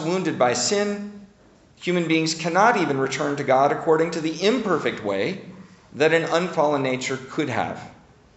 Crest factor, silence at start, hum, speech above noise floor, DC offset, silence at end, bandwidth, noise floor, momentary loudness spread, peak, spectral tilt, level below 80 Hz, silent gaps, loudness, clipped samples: 18 dB; 0 s; none; 32 dB; under 0.1%; 0.45 s; 8.2 kHz; -53 dBFS; 9 LU; -4 dBFS; -4.5 dB/octave; -62 dBFS; none; -22 LUFS; under 0.1%